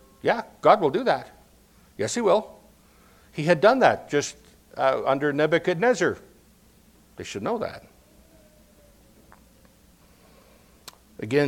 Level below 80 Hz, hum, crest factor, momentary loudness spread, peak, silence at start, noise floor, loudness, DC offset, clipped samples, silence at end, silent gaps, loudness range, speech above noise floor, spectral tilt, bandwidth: -60 dBFS; none; 24 dB; 20 LU; -2 dBFS; 0.25 s; -56 dBFS; -23 LUFS; under 0.1%; under 0.1%; 0 s; none; 14 LU; 34 dB; -5 dB/octave; 16.5 kHz